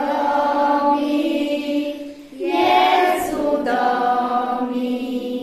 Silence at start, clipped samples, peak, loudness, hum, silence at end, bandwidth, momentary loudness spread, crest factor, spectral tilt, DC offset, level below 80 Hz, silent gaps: 0 s; under 0.1%; -4 dBFS; -19 LUFS; none; 0 s; 14.5 kHz; 9 LU; 16 dB; -4 dB/octave; under 0.1%; -54 dBFS; none